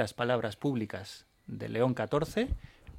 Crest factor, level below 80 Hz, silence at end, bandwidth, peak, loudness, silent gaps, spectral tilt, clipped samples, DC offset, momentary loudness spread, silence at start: 18 dB; -48 dBFS; 0 s; 16.5 kHz; -14 dBFS; -33 LUFS; none; -6.5 dB/octave; under 0.1%; under 0.1%; 14 LU; 0 s